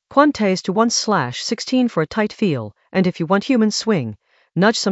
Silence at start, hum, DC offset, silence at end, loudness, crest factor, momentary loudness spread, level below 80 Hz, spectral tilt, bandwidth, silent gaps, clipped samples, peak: 0.1 s; none; under 0.1%; 0 s; -19 LUFS; 18 dB; 7 LU; -58 dBFS; -4.5 dB/octave; 8.2 kHz; none; under 0.1%; 0 dBFS